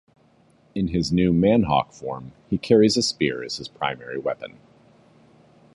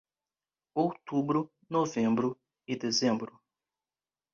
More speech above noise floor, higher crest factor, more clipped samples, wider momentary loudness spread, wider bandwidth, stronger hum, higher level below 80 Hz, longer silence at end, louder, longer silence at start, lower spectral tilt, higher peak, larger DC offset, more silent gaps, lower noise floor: second, 36 dB vs over 60 dB; about the same, 20 dB vs 18 dB; neither; first, 16 LU vs 10 LU; first, 11.5 kHz vs 7.4 kHz; neither; first, -48 dBFS vs -72 dBFS; first, 1.3 s vs 1.1 s; first, -22 LUFS vs -31 LUFS; about the same, 0.75 s vs 0.75 s; about the same, -5.5 dB/octave vs -5 dB/octave; first, -4 dBFS vs -14 dBFS; neither; neither; second, -58 dBFS vs under -90 dBFS